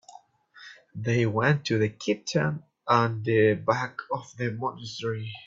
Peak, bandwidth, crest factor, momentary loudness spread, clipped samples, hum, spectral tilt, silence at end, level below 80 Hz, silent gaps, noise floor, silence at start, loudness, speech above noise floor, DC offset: -6 dBFS; 7.8 kHz; 22 dB; 12 LU; under 0.1%; none; -6 dB/octave; 0.05 s; -64 dBFS; none; -53 dBFS; 0.55 s; -27 LUFS; 27 dB; under 0.1%